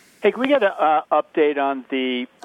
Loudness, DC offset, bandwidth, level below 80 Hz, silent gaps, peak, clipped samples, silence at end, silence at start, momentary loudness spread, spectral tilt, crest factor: -20 LUFS; under 0.1%; 10.5 kHz; -78 dBFS; none; -2 dBFS; under 0.1%; 0.2 s; 0.2 s; 6 LU; -5.5 dB/octave; 18 dB